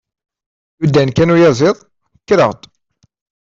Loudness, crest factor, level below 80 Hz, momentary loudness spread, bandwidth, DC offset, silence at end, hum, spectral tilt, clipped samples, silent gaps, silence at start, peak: -12 LUFS; 12 dB; -46 dBFS; 10 LU; 7.6 kHz; under 0.1%; 0.95 s; none; -6.5 dB/octave; under 0.1%; none; 0.8 s; -2 dBFS